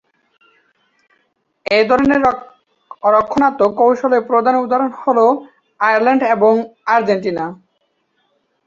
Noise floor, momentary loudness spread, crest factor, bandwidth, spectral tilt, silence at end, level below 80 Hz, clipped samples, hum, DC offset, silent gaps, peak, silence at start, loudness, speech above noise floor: -66 dBFS; 8 LU; 16 dB; 7.4 kHz; -6 dB/octave; 1.15 s; -54 dBFS; under 0.1%; none; under 0.1%; none; -2 dBFS; 1.7 s; -15 LUFS; 52 dB